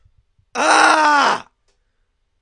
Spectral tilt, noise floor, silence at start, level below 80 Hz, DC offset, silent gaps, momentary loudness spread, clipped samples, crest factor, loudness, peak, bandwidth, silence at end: -0.5 dB/octave; -66 dBFS; 0.55 s; -64 dBFS; under 0.1%; none; 13 LU; under 0.1%; 18 dB; -14 LUFS; 0 dBFS; 11.5 kHz; 1 s